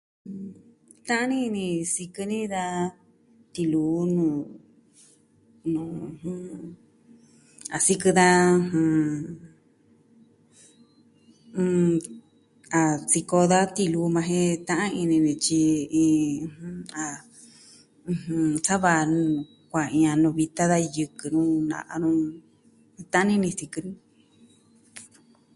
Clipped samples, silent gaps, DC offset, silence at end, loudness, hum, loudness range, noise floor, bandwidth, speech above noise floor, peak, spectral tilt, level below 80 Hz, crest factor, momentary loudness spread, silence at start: under 0.1%; none; under 0.1%; 0.5 s; -24 LUFS; none; 7 LU; -60 dBFS; 11.5 kHz; 36 dB; -4 dBFS; -5 dB/octave; -62 dBFS; 20 dB; 18 LU; 0.25 s